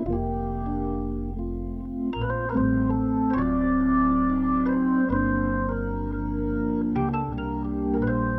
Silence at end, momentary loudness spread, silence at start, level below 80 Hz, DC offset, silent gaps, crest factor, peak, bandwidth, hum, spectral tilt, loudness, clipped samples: 0 s; 8 LU; 0 s; -34 dBFS; under 0.1%; none; 12 dB; -12 dBFS; 3.6 kHz; none; -11 dB/octave; -25 LUFS; under 0.1%